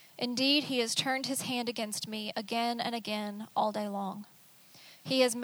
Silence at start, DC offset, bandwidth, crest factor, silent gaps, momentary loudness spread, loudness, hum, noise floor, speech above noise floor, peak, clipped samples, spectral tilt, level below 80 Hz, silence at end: 0 s; under 0.1%; over 20 kHz; 20 dB; none; 10 LU; -32 LUFS; none; -58 dBFS; 25 dB; -12 dBFS; under 0.1%; -3 dB/octave; -82 dBFS; 0 s